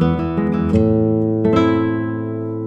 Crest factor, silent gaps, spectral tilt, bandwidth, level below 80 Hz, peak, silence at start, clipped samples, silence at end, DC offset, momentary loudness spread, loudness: 16 dB; none; -9.5 dB/octave; 7.8 kHz; -38 dBFS; -2 dBFS; 0 s; under 0.1%; 0 s; under 0.1%; 8 LU; -17 LUFS